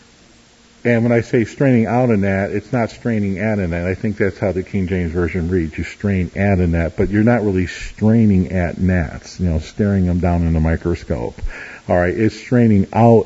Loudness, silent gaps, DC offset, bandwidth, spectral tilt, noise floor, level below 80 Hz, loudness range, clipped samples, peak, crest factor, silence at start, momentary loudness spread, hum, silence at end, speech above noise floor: -17 LUFS; none; under 0.1%; 8 kHz; -8.5 dB/octave; -48 dBFS; -32 dBFS; 3 LU; under 0.1%; 0 dBFS; 16 dB; 0.85 s; 8 LU; none; 0 s; 32 dB